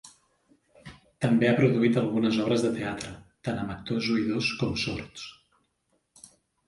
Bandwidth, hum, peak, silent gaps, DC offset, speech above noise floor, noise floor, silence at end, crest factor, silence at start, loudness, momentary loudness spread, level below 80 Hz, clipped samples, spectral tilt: 11.5 kHz; none; -10 dBFS; none; under 0.1%; 48 dB; -74 dBFS; 1.35 s; 18 dB; 0.05 s; -27 LUFS; 15 LU; -56 dBFS; under 0.1%; -6 dB/octave